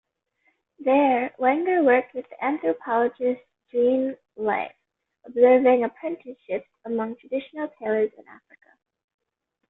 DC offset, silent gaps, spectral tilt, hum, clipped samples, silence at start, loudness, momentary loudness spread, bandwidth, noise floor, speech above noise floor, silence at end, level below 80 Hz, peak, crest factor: under 0.1%; none; -9 dB/octave; none; under 0.1%; 0.8 s; -23 LUFS; 14 LU; 3.9 kHz; -70 dBFS; 47 dB; 1.35 s; -70 dBFS; -6 dBFS; 18 dB